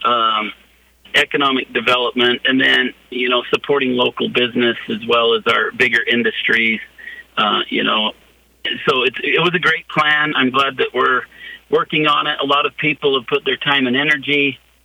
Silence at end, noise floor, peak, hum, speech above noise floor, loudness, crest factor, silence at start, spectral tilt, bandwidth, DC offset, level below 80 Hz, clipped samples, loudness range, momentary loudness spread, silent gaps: 0.3 s; -52 dBFS; -2 dBFS; none; 35 dB; -16 LUFS; 16 dB; 0 s; -4.5 dB/octave; 16 kHz; under 0.1%; -58 dBFS; under 0.1%; 1 LU; 6 LU; none